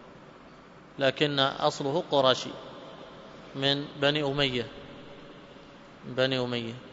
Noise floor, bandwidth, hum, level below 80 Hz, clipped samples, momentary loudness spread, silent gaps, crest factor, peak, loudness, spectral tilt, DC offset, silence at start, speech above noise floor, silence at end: -51 dBFS; 8 kHz; none; -60 dBFS; under 0.1%; 22 LU; none; 24 dB; -6 dBFS; -27 LUFS; -5 dB/octave; under 0.1%; 0 s; 23 dB; 0 s